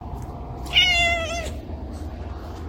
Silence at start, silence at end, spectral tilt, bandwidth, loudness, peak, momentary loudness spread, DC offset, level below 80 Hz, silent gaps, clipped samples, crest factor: 0 s; 0 s; -3 dB/octave; 16.5 kHz; -19 LUFS; -6 dBFS; 18 LU; under 0.1%; -36 dBFS; none; under 0.1%; 20 dB